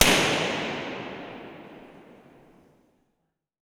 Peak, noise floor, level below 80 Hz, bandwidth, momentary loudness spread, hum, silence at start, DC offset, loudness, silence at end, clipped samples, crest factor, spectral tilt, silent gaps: -2 dBFS; -78 dBFS; -50 dBFS; over 20 kHz; 26 LU; none; 0 s; under 0.1%; -25 LUFS; 1.6 s; under 0.1%; 26 dB; -2 dB/octave; none